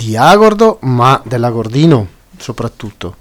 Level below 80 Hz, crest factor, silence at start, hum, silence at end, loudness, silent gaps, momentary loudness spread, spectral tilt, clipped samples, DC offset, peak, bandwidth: -40 dBFS; 10 dB; 0 s; none; 0.1 s; -10 LUFS; none; 19 LU; -6.5 dB/octave; 0.6%; under 0.1%; 0 dBFS; 19 kHz